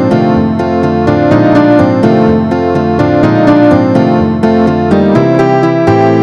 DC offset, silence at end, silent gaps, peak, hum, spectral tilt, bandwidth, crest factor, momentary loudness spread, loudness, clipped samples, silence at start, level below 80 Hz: 0.2%; 0 s; none; 0 dBFS; none; -8.5 dB/octave; 8.2 kHz; 8 dB; 4 LU; -8 LUFS; 0.7%; 0 s; -34 dBFS